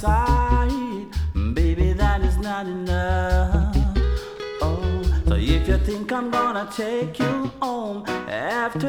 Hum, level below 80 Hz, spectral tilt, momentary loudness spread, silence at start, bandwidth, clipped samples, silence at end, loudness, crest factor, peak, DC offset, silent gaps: none; -24 dBFS; -7 dB/octave; 7 LU; 0 s; 12 kHz; under 0.1%; 0 s; -23 LUFS; 14 dB; -6 dBFS; under 0.1%; none